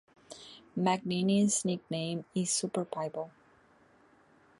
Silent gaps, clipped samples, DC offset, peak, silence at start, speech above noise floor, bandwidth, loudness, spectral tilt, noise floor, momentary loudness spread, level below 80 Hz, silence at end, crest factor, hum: none; under 0.1%; under 0.1%; -14 dBFS; 0.3 s; 32 dB; 11.5 kHz; -32 LUFS; -4.5 dB/octave; -63 dBFS; 20 LU; -74 dBFS; 1.3 s; 20 dB; none